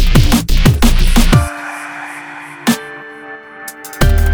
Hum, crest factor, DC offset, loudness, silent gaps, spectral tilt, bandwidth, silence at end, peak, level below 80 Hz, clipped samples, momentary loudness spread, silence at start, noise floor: none; 12 dB; under 0.1%; -14 LUFS; none; -5 dB/octave; over 20 kHz; 0 s; 0 dBFS; -14 dBFS; under 0.1%; 18 LU; 0 s; -32 dBFS